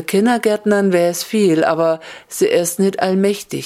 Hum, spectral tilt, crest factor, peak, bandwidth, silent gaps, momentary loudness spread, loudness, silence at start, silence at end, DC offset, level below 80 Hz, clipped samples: none; -5 dB/octave; 16 dB; 0 dBFS; 16 kHz; none; 5 LU; -16 LUFS; 0 s; 0 s; under 0.1%; -64 dBFS; under 0.1%